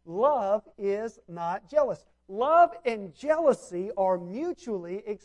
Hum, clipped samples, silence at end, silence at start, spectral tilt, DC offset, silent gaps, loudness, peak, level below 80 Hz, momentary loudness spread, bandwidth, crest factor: none; under 0.1%; 0.05 s; 0.05 s; -6 dB/octave; under 0.1%; none; -27 LUFS; -10 dBFS; -66 dBFS; 13 LU; 11 kHz; 18 dB